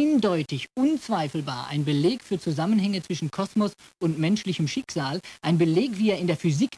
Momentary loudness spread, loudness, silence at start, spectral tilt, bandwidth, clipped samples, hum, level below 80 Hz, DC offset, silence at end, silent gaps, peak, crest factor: 7 LU; -25 LUFS; 0 s; -6.5 dB/octave; 11 kHz; under 0.1%; none; -64 dBFS; under 0.1%; 0 s; none; -10 dBFS; 14 dB